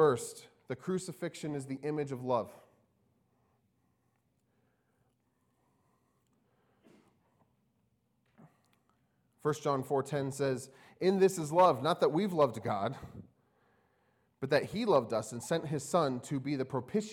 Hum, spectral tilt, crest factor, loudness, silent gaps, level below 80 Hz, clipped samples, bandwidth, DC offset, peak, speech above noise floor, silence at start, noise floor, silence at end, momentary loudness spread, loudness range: none; -5.5 dB/octave; 22 dB; -33 LUFS; none; -74 dBFS; under 0.1%; 18 kHz; under 0.1%; -12 dBFS; 44 dB; 0 s; -77 dBFS; 0 s; 13 LU; 11 LU